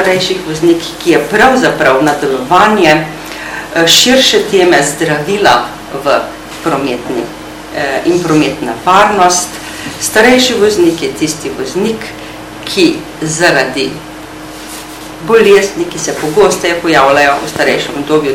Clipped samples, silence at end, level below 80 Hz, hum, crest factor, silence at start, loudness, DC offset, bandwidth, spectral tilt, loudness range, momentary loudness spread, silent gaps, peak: 2%; 0 s; -40 dBFS; none; 10 dB; 0 s; -10 LUFS; under 0.1%; over 20 kHz; -3 dB/octave; 5 LU; 16 LU; none; 0 dBFS